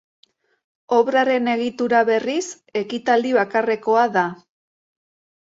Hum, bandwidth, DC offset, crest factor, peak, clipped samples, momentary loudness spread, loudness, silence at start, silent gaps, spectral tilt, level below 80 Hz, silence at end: none; 8 kHz; under 0.1%; 16 dB; -4 dBFS; under 0.1%; 9 LU; -20 LUFS; 0.9 s; none; -4.5 dB/octave; -70 dBFS; 1.2 s